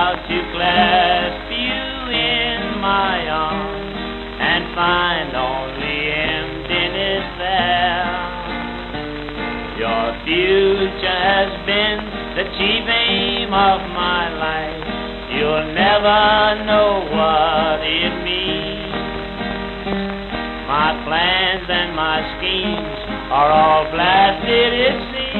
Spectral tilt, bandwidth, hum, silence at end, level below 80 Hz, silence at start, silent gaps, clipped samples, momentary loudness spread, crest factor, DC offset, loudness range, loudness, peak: -6.5 dB/octave; 6 kHz; none; 0 s; -36 dBFS; 0 s; none; under 0.1%; 11 LU; 18 dB; under 0.1%; 4 LU; -17 LUFS; 0 dBFS